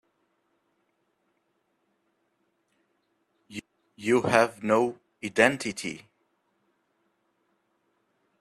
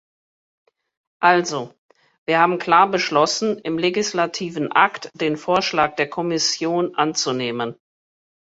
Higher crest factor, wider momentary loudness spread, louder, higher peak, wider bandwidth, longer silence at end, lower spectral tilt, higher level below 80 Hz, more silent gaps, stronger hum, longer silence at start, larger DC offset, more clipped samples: first, 26 dB vs 20 dB; first, 20 LU vs 9 LU; second, -25 LUFS vs -20 LUFS; second, -6 dBFS vs -2 dBFS; first, 13 kHz vs 8 kHz; first, 2.45 s vs 0.75 s; about the same, -4.5 dB/octave vs -3.5 dB/octave; second, -70 dBFS vs -64 dBFS; second, none vs 1.78-1.89 s, 2.18-2.26 s; neither; first, 3.5 s vs 1.2 s; neither; neither